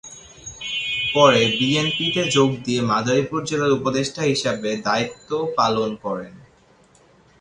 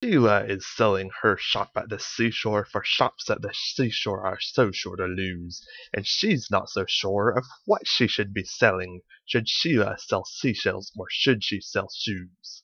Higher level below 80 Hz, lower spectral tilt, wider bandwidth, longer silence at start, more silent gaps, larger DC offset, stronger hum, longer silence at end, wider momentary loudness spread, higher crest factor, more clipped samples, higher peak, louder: about the same, -56 dBFS vs -60 dBFS; about the same, -4 dB/octave vs -4.5 dB/octave; first, 11 kHz vs 7.2 kHz; about the same, 0.05 s vs 0 s; neither; neither; neither; first, 1 s vs 0.05 s; first, 13 LU vs 9 LU; about the same, 20 dB vs 22 dB; neither; about the same, -2 dBFS vs -4 dBFS; first, -20 LUFS vs -25 LUFS